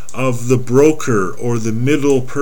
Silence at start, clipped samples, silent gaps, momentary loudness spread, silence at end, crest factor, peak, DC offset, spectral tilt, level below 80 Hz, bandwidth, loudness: 0.1 s; under 0.1%; none; 7 LU; 0 s; 16 dB; 0 dBFS; 10%; -6.5 dB/octave; -48 dBFS; 18.5 kHz; -15 LUFS